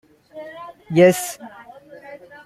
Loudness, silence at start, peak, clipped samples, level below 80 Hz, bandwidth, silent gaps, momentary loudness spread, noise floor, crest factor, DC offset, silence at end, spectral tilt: -17 LUFS; 0.35 s; -2 dBFS; under 0.1%; -64 dBFS; 15.5 kHz; none; 25 LU; -42 dBFS; 20 dB; under 0.1%; 0.3 s; -5.5 dB/octave